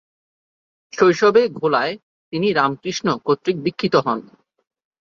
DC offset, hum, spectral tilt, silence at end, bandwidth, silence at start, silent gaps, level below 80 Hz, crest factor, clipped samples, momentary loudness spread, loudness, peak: under 0.1%; none; -5.5 dB/octave; 0.9 s; 7.4 kHz; 0.95 s; 2.03-2.32 s; -62 dBFS; 18 dB; under 0.1%; 12 LU; -19 LUFS; -2 dBFS